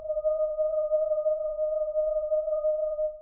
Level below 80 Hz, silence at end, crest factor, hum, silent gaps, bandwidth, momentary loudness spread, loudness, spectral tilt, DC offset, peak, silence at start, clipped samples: -54 dBFS; 0 s; 10 dB; none; none; 1.4 kHz; 2 LU; -28 LUFS; -10.5 dB/octave; under 0.1%; -18 dBFS; 0 s; under 0.1%